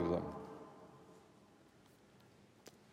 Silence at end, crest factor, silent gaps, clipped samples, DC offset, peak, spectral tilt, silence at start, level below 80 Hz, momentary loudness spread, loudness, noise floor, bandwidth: 0 s; 24 dB; none; under 0.1%; under 0.1%; -24 dBFS; -7.5 dB/octave; 0 s; -72 dBFS; 23 LU; -46 LUFS; -66 dBFS; 16 kHz